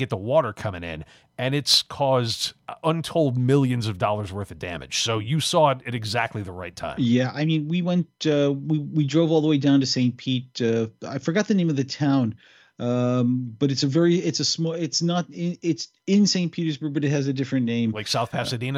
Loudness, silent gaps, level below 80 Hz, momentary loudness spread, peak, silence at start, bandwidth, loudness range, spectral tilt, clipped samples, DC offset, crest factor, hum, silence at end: -23 LUFS; none; -58 dBFS; 10 LU; -6 dBFS; 0 s; 16 kHz; 2 LU; -5.5 dB/octave; under 0.1%; under 0.1%; 16 dB; none; 0 s